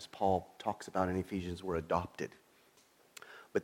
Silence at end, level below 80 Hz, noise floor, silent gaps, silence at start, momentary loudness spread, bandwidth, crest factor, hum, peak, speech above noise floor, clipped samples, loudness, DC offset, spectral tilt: 0 s; -60 dBFS; -67 dBFS; none; 0 s; 19 LU; 17 kHz; 20 dB; none; -16 dBFS; 31 dB; under 0.1%; -37 LUFS; under 0.1%; -6 dB/octave